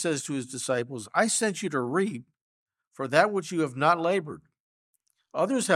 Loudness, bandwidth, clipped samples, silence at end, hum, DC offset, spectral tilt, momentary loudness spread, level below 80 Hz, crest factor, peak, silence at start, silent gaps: -27 LUFS; 15.5 kHz; under 0.1%; 0 s; none; under 0.1%; -4 dB/octave; 13 LU; -78 dBFS; 22 dB; -6 dBFS; 0 s; 2.41-2.66 s, 2.87-2.91 s, 4.60-4.94 s